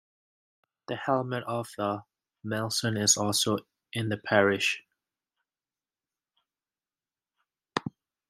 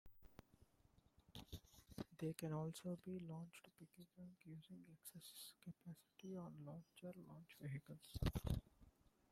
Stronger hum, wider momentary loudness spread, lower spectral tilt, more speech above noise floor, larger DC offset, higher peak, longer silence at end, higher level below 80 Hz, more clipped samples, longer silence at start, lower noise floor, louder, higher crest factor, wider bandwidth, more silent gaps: neither; about the same, 14 LU vs 15 LU; second, -3 dB/octave vs -6 dB/octave; first, over 62 dB vs 24 dB; neither; first, -6 dBFS vs -28 dBFS; about the same, 0.4 s vs 0.4 s; second, -74 dBFS vs -62 dBFS; neither; first, 0.9 s vs 0.05 s; first, under -90 dBFS vs -76 dBFS; first, -28 LUFS vs -53 LUFS; about the same, 26 dB vs 24 dB; about the same, 16 kHz vs 16.5 kHz; neither